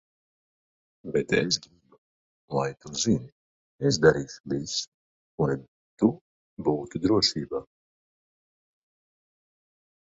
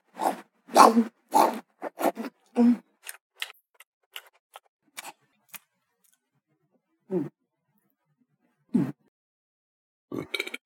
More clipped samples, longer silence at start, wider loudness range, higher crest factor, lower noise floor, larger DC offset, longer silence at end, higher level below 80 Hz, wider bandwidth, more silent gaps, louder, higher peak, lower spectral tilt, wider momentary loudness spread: neither; first, 1.05 s vs 0.15 s; second, 3 LU vs 20 LU; about the same, 24 dB vs 28 dB; first, under -90 dBFS vs -75 dBFS; neither; first, 2.45 s vs 0.1 s; first, -56 dBFS vs -84 dBFS; second, 7.8 kHz vs 17.5 kHz; first, 1.98-2.48 s, 3.32-3.79 s, 4.40-4.44 s, 4.87-5.38 s, 5.68-5.97 s, 6.21-6.57 s vs 3.21-3.30 s, 3.70-3.74 s, 3.87-4.11 s, 4.40-4.50 s, 4.69-4.79 s, 9.08-10.08 s; about the same, -27 LUFS vs -25 LUFS; second, -6 dBFS vs 0 dBFS; about the same, -4.5 dB/octave vs -4.5 dB/octave; second, 13 LU vs 26 LU